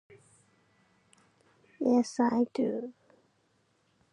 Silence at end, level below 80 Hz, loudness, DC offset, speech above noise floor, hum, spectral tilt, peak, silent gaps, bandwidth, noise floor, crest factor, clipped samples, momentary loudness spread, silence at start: 1.2 s; -80 dBFS; -29 LUFS; under 0.1%; 44 dB; none; -5.5 dB/octave; -14 dBFS; none; 10 kHz; -72 dBFS; 20 dB; under 0.1%; 10 LU; 1.8 s